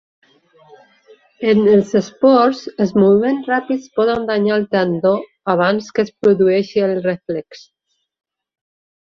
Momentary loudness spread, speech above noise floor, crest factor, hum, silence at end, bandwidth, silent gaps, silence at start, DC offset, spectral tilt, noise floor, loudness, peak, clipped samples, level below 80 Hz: 9 LU; 36 dB; 16 dB; none; 1.45 s; 7 kHz; none; 1.4 s; under 0.1%; -7 dB/octave; -51 dBFS; -16 LUFS; -2 dBFS; under 0.1%; -56 dBFS